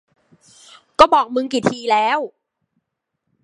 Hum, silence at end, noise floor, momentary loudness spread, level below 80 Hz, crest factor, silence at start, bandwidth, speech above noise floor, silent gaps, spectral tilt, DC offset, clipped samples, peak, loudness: none; 1.15 s; -77 dBFS; 13 LU; -52 dBFS; 20 dB; 1 s; 11.5 kHz; 61 dB; none; -4 dB/octave; under 0.1%; under 0.1%; 0 dBFS; -16 LUFS